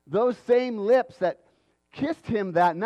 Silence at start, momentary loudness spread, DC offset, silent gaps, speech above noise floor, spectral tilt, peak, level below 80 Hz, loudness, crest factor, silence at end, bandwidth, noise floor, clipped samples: 0.1 s; 8 LU; under 0.1%; none; 39 dB; -7 dB/octave; -10 dBFS; -62 dBFS; -25 LUFS; 16 dB; 0 s; 8.6 kHz; -63 dBFS; under 0.1%